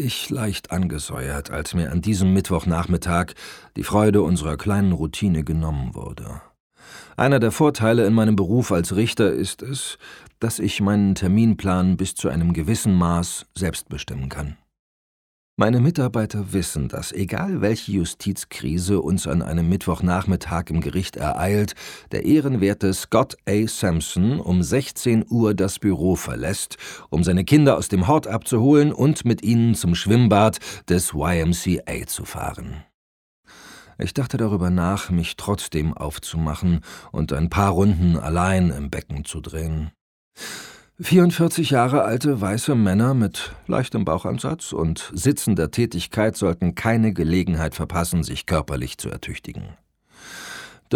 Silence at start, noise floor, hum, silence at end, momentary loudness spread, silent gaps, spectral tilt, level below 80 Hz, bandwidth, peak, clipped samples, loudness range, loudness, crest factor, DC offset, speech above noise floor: 0 s; -46 dBFS; none; 0 s; 13 LU; 6.60-6.70 s, 14.79-15.57 s, 32.94-33.43 s, 40.01-40.31 s; -6 dB/octave; -38 dBFS; 17.5 kHz; -2 dBFS; under 0.1%; 5 LU; -21 LUFS; 20 dB; under 0.1%; 25 dB